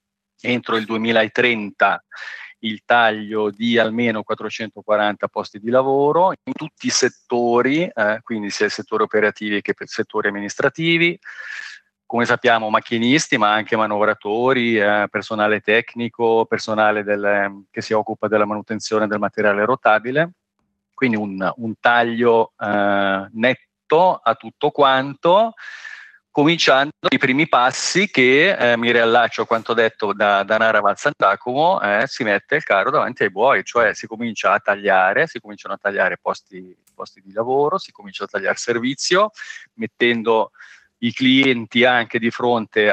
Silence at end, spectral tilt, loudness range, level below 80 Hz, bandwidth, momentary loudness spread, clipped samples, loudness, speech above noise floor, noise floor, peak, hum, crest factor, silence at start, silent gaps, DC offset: 0 s; -4 dB/octave; 5 LU; -72 dBFS; 9 kHz; 11 LU; under 0.1%; -18 LUFS; 54 dB; -73 dBFS; 0 dBFS; none; 18 dB; 0.45 s; none; under 0.1%